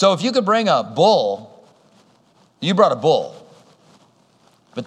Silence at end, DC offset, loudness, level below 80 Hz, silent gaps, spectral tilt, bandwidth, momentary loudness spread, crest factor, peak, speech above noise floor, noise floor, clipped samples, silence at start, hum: 0 s; under 0.1%; -17 LUFS; -76 dBFS; none; -5 dB/octave; 10 kHz; 14 LU; 20 dB; 0 dBFS; 40 dB; -56 dBFS; under 0.1%; 0 s; none